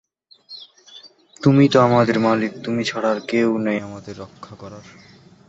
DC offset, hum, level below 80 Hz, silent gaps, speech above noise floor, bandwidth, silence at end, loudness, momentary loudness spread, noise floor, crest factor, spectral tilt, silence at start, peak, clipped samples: under 0.1%; none; -58 dBFS; none; 29 dB; 8 kHz; 0.65 s; -18 LUFS; 24 LU; -48 dBFS; 18 dB; -6.5 dB/octave; 0.5 s; -2 dBFS; under 0.1%